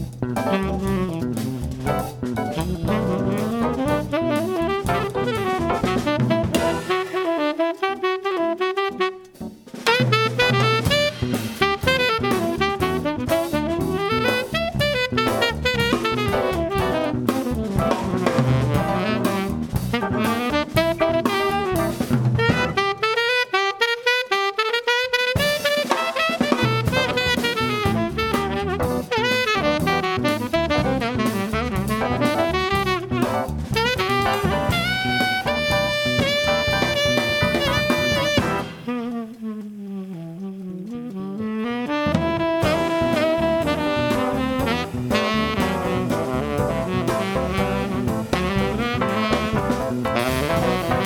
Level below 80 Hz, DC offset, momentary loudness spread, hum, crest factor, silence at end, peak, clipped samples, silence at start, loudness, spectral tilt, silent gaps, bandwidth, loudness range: -38 dBFS; under 0.1%; 6 LU; none; 18 dB; 0 s; -2 dBFS; under 0.1%; 0 s; -21 LUFS; -5 dB/octave; none; 19 kHz; 4 LU